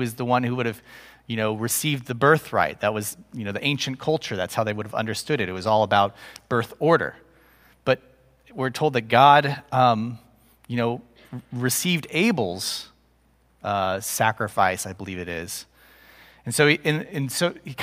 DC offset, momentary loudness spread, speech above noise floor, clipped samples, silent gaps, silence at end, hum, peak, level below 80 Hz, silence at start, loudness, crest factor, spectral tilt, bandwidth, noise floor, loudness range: under 0.1%; 13 LU; 38 dB; under 0.1%; none; 0 s; none; -2 dBFS; -60 dBFS; 0 s; -23 LUFS; 22 dB; -4.5 dB/octave; 16 kHz; -61 dBFS; 5 LU